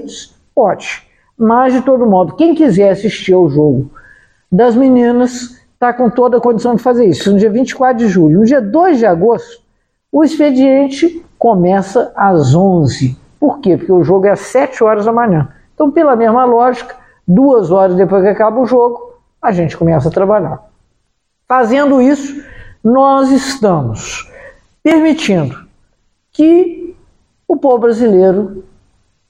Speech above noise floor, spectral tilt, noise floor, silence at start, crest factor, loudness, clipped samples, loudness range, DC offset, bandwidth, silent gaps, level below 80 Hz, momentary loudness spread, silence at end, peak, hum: 55 dB; -7 dB/octave; -65 dBFS; 0 s; 10 dB; -11 LUFS; under 0.1%; 3 LU; under 0.1%; 10.5 kHz; none; -44 dBFS; 11 LU; 0.7 s; 0 dBFS; none